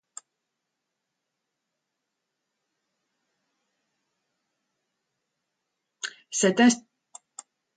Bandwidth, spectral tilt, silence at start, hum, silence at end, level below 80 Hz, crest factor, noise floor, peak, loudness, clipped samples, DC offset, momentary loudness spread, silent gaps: 9.4 kHz; -3.5 dB/octave; 6.05 s; none; 0.95 s; -80 dBFS; 24 dB; -83 dBFS; -8 dBFS; -23 LUFS; under 0.1%; under 0.1%; 26 LU; none